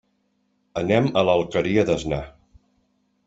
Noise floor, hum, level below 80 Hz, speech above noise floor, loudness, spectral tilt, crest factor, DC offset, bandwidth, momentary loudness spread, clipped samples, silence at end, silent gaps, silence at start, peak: -69 dBFS; none; -48 dBFS; 48 dB; -22 LUFS; -6.5 dB/octave; 20 dB; under 0.1%; 8 kHz; 12 LU; under 0.1%; 0.95 s; none; 0.75 s; -4 dBFS